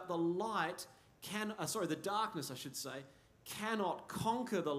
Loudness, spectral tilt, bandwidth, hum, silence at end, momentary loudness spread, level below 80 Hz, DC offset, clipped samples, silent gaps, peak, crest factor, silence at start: -40 LUFS; -4 dB/octave; 15.5 kHz; none; 0 s; 12 LU; -76 dBFS; under 0.1%; under 0.1%; none; -22 dBFS; 18 dB; 0 s